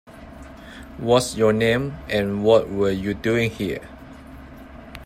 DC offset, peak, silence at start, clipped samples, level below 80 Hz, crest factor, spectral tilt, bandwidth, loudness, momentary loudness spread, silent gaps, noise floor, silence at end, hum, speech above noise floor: under 0.1%; -2 dBFS; 0.1 s; under 0.1%; -44 dBFS; 20 dB; -5.5 dB/octave; 15 kHz; -21 LUFS; 24 LU; none; -41 dBFS; 0 s; none; 20 dB